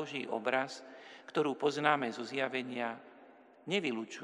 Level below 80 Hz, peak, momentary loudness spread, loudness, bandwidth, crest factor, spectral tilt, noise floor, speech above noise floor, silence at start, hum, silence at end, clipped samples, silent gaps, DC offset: under -90 dBFS; -12 dBFS; 18 LU; -35 LUFS; 11 kHz; 24 dB; -4.5 dB/octave; -59 dBFS; 24 dB; 0 s; none; 0 s; under 0.1%; none; under 0.1%